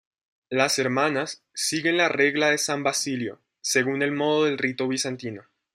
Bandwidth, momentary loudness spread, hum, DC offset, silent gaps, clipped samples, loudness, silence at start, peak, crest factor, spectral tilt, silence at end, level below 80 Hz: 16 kHz; 11 LU; none; under 0.1%; none; under 0.1%; -24 LUFS; 0.5 s; -4 dBFS; 20 dB; -3 dB/octave; 0.35 s; -72 dBFS